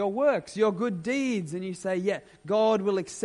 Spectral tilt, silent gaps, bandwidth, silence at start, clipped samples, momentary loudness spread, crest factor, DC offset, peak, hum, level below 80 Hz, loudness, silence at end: -5.5 dB/octave; none; 11.5 kHz; 0 s; under 0.1%; 8 LU; 14 dB; under 0.1%; -12 dBFS; none; -68 dBFS; -27 LUFS; 0 s